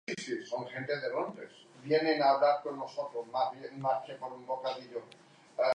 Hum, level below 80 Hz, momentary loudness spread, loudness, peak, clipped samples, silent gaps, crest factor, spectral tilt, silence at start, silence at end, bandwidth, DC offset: none; -86 dBFS; 17 LU; -33 LUFS; -14 dBFS; under 0.1%; none; 18 dB; -5 dB/octave; 0.1 s; 0 s; 10 kHz; under 0.1%